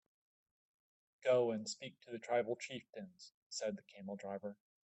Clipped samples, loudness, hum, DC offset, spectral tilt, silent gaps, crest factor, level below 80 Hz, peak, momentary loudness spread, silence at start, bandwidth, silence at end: under 0.1%; -41 LUFS; none; under 0.1%; -4 dB/octave; 3.34-3.50 s; 20 dB; -88 dBFS; -22 dBFS; 17 LU; 1.2 s; 8.2 kHz; 0.35 s